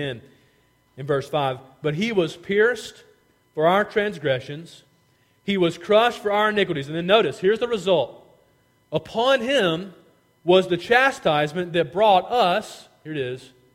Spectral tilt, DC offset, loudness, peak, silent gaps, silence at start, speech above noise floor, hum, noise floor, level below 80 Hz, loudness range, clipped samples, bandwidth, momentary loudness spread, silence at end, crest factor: -5 dB/octave; under 0.1%; -21 LUFS; -2 dBFS; none; 0 s; 40 dB; none; -62 dBFS; -60 dBFS; 4 LU; under 0.1%; 16 kHz; 15 LU; 0.3 s; 20 dB